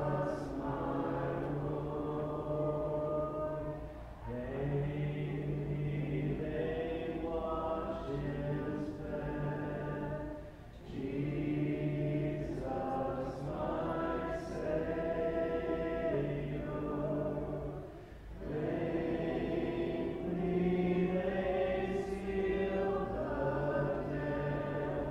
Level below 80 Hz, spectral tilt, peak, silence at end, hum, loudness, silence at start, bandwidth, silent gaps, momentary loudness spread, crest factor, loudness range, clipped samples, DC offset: -50 dBFS; -9 dB/octave; -22 dBFS; 0 s; none; -37 LUFS; 0 s; 9.8 kHz; none; 6 LU; 14 dB; 4 LU; under 0.1%; under 0.1%